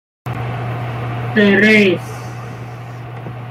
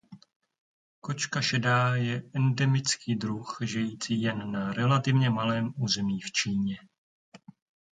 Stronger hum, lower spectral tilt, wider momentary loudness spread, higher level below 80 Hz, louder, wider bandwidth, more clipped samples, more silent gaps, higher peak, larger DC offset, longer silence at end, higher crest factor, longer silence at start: neither; first, -6.5 dB/octave vs -5 dB/octave; first, 20 LU vs 8 LU; first, -48 dBFS vs -64 dBFS; first, -14 LUFS vs -28 LUFS; first, 14.5 kHz vs 9.4 kHz; neither; second, none vs 0.36-0.40 s, 0.58-1.02 s, 6.98-7.32 s; first, -2 dBFS vs -12 dBFS; neither; second, 0 s vs 0.55 s; about the same, 16 dB vs 18 dB; first, 0.25 s vs 0.1 s